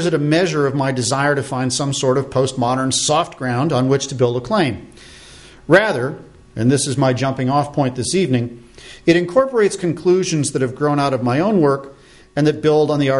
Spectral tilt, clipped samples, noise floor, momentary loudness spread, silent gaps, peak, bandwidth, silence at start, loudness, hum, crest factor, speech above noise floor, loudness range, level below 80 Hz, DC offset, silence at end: -5 dB/octave; under 0.1%; -41 dBFS; 6 LU; none; -2 dBFS; 11.5 kHz; 0 s; -17 LUFS; none; 16 dB; 25 dB; 1 LU; -50 dBFS; under 0.1%; 0 s